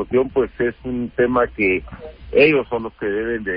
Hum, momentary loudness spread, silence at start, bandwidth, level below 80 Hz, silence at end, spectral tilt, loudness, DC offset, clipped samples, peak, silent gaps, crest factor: none; 11 LU; 0 s; 5.2 kHz; -42 dBFS; 0 s; -11 dB/octave; -19 LUFS; under 0.1%; under 0.1%; -2 dBFS; none; 16 dB